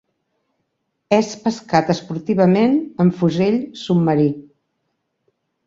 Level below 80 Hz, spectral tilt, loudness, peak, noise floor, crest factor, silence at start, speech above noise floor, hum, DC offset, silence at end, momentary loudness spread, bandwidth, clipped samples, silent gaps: -58 dBFS; -7 dB/octave; -18 LUFS; -2 dBFS; -73 dBFS; 18 dB; 1.1 s; 56 dB; none; under 0.1%; 1.25 s; 7 LU; 7.6 kHz; under 0.1%; none